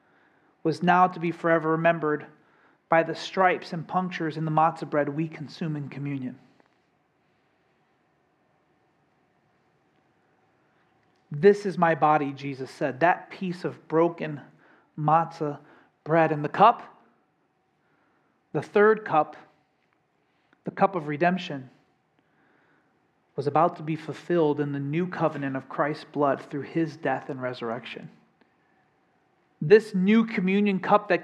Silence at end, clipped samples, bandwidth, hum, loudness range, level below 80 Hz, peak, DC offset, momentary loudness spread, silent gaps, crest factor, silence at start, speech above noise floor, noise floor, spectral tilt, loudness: 0 s; under 0.1%; 10 kHz; none; 6 LU; -80 dBFS; -4 dBFS; under 0.1%; 14 LU; none; 22 dB; 0.65 s; 45 dB; -70 dBFS; -7.5 dB/octave; -25 LUFS